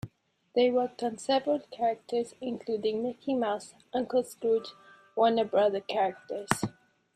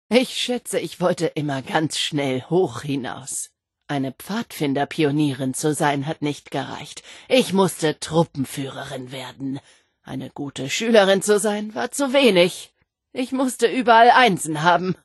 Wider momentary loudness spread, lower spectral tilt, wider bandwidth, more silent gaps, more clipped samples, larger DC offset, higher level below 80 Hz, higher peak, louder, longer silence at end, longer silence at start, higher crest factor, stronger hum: second, 11 LU vs 16 LU; about the same, -5 dB/octave vs -4.5 dB/octave; about the same, 13 kHz vs 12.5 kHz; neither; neither; neither; about the same, -68 dBFS vs -64 dBFS; second, -6 dBFS vs -2 dBFS; second, -30 LUFS vs -21 LUFS; first, 0.45 s vs 0.1 s; about the same, 0.05 s vs 0.1 s; first, 24 dB vs 18 dB; neither